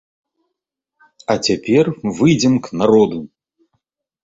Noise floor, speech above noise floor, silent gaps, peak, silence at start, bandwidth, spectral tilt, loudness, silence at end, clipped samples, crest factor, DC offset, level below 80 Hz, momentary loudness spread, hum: -80 dBFS; 65 dB; none; -2 dBFS; 1.3 s; 8 kHz; -5.5 dB/octave; -16 LUFS; 1 s; under 0.1%; 16 dB; under 0.1%; -52 dBFS; 8 LU; none